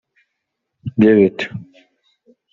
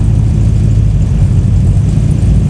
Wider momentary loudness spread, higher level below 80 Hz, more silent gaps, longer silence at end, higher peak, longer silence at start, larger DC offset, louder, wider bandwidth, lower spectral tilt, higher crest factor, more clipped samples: first, 21 LU vs 1 LU; second, -56 dBFS vs -14 dBFS; neither; first, 0.9 s vs 0 s; about the same, -2 dBFS vs 0 dBFS; first, 0.85 s vs 0 s; neither; second, -15 LUFS vs -10 LUFS; second, 7.4 kHz vs 10.5 kHz; second, -6.5 dB/octave vs -8.5 dB/octave; first, 18 dB vs 8 dB; second, under 0.1% vs 0.5%